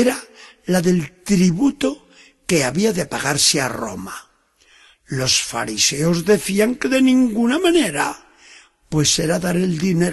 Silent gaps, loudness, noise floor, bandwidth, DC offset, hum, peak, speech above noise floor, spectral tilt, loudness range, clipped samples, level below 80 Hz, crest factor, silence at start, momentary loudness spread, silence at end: none; -18 LUFS; -56 dBFS; 13 kHz; under 0.1%; none; -2 dBFS; 38 dB; -4 dB/octave; 3 LU; under 0.1%; -48 dBFS; 16 dB; 0 s; 13 LU; 0 s